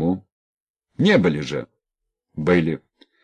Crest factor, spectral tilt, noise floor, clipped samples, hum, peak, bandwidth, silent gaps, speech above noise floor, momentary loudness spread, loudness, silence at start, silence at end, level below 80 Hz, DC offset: 18 dB; -7 dB/octave; -82 dBFS; under 0.1%; none; -6 dBFS; 9.6 kHz; 0.32-0.74 s; 63 dB; 15 LU; -21 LUFS; 0 s; 0.45 s; -50 dBFS; under 0.1%